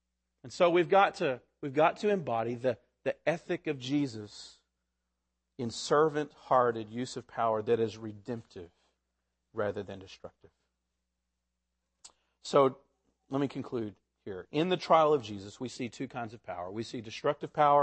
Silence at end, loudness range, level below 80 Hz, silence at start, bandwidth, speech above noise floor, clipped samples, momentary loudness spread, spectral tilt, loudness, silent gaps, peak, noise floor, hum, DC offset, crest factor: 0 s; 12 LU; -72 dBFS; 0.45 s; 8.8 kHz; 54 dB; under 0.1%; 19 LU; -5.5 dB/octave; -31 LUFS; none; -10 dBFS; -84 dBFS; none; under 0.1%; 22 dB